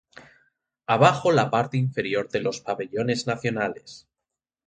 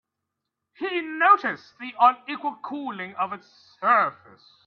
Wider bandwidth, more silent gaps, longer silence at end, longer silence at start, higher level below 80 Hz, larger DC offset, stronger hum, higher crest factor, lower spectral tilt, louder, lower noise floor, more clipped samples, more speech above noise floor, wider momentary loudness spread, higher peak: first, 9.4 kHz vs 6.4 kHz; neither; first, 0.7 s vs 0.55 s; second, 0.15 s vs 0.8 s; first, -62 dBFS vs -80 dBFS; neither; neither; about the same, 22 dB vs 20 dB; about the same, -5.5 dB/octave vs -5.5 dB/octave; about the same, -24 LUFS vs -23 LUFS; first, -87 dBFS vs -83 dBFS; neither; first, 63 dB vs 59 dB; second, 11 LU vs 15 LU; about the same, -2 dBFS vs -4 dBFS